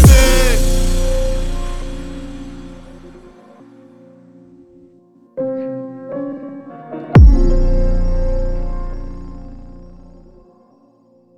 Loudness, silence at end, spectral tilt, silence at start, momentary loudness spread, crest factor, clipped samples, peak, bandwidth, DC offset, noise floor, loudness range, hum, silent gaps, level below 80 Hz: -17 LUFS; 1.55 s; -5.5 dB/octave; 0 s; 26 LU; 16 dB; under 0.1%; 0 dBFS; 17 kHz; under 0.1%; -52 dBFS; 17 LU; none; none; -18 dBFS